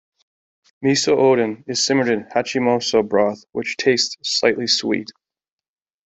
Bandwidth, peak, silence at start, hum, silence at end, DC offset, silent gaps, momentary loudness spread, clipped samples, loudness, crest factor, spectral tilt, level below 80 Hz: 8.4 kHz; -2 dBFS; 0.8 s; none; 1.05 s; under 0.1%; none; 8 LU; under 0.1%; -19 LUFS; 18 dB; -3.5 dB/octave; -62 dBFS